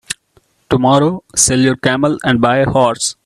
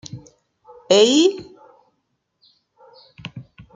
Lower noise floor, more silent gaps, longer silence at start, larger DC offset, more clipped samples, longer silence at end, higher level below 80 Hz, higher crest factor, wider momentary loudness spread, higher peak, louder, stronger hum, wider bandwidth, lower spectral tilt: second, -55 dBFS vs -72 dBFS; neither; about the same, 0.1 s vs 0.15 s; neither; neither; second, 0.15 s vs 0.35 s; first, -42 dBFS vs -62 dBFS; second, 14 dB vs 20 dB; second, 6 LU vs 26 LU; about the same, 0 dBFS vs -2 dBFS; about the same, -13 LUFS vs -15 LUFS; neither; first, 13 kHz vs 9.6 kHz; about the same, -4 dB/octave vs -3.5 dB/octave